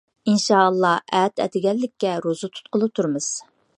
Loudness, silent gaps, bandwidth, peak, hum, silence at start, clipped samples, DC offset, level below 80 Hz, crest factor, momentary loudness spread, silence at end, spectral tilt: -21 LUFS; none; 11 kHz; -2 dBFS; none; 0.25 s; under 0.1%; under 0.1%; -72 dBFS; 20 dB; 10 LU; 0.4 s; -4.5 dB/octave